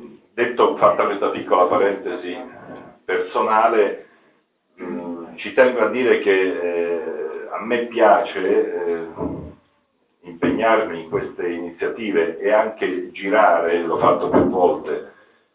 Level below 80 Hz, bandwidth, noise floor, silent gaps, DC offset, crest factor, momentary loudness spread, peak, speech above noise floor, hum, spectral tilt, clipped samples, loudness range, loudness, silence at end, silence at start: -54 dBFS; 4 kHz; -65 dBFS; none; under 0.1%; 18 dB; 14 LU; -2 dBFS; 46 dB; none; -9 dB/octave; under 0.1%; 4 LU; -19 LUFS; 0.45 s; 0 s